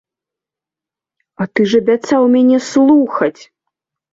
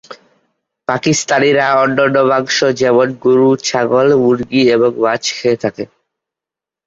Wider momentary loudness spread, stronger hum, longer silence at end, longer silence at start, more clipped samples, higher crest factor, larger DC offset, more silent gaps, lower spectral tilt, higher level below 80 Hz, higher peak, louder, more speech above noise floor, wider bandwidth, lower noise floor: about the same, 9 LU vs 7 LU; neither; second, 0.8 s vs 1 s; first, 1.4 s vs 0.1 s; neither; about the same, 14 dB vs 12 dB; neither; neither; first, -6 dB/octave vs -4.5 dB/octave; about the same, -60 dBFS vs -56 dBFS; about the same, -2 dBFS vs 0 dBFS; about the same, -13 LUFS vs -13 LUFS; about the same, 75 dB vs 74 dB; about the same, 7.8 kHz vs 8 kHz; about the same, -87 dBFS vs -86 dBFS